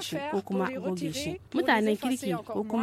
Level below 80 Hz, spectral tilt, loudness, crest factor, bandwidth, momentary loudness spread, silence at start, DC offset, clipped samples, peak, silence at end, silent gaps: -62 dBFS; -5 dB/octave; -29 LUFS; 18 dB; 16.5 kHz; 8 LU; 0 s; under 0.1%; under 0.1%; -12 dBFS; 0 s; none